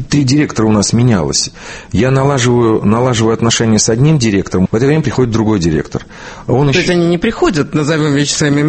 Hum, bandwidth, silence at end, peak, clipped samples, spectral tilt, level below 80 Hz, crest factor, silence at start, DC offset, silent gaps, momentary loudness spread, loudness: none; 8.8 kHz; 0 s; 0 dBFS; under 0.1%; -5 dB/octave; -34 dBFS; 12 dB; 0 s; under 0.1%; none; 6 LU; -12 LUFS